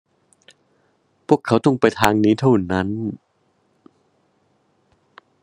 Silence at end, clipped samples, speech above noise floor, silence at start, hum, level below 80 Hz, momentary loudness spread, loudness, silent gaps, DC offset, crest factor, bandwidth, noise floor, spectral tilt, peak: 2.25 s; under 0.1%; 47 dB; 1.3 s; none; -52 dBFS; 13 LU; -18 LUFS; none; under 0.1%; 22 dB; 12 kHz; -64 dBFS; -6.5 dB/octave; 0 dBFS